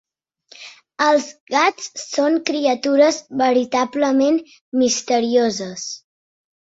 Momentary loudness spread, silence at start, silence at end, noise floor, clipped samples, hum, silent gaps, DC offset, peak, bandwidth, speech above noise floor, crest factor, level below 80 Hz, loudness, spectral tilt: 14 LU; 0.6 s; 0.75 s; -53 dBFS; under 0.1%; none; 1.40-1.47 s, 4.61-4.72 s; under 0.1%; -2 dBFS; 8 kHz; 35 dB; 18 dB; -66 dBFS; -18 LUFS; -3 dB/octave